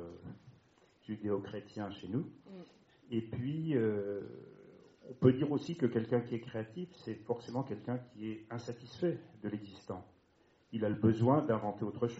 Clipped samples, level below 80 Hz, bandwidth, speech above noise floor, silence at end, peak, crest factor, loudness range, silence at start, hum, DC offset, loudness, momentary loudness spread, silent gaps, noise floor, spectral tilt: under 0.1%; -72 dBFS; 7.6 kHz; 34 dB; 0 s; -12 dBFS; 24 dB; 7 LU; 0 s; none; under 0.1%; -37 LUFS; 19 LU; none; -70 dBFS; -7.5 dB/octave